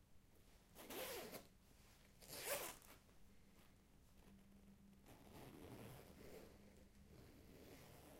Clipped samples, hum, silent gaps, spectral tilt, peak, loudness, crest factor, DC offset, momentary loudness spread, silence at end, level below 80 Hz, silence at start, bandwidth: under 0.1%; none; none; -3 dB/octave; -32 dBFS; -55 LUFS; 26 dB; under 0.1%; 20 LU; 0 s; -72 dBFS; 0 s; 16 kHz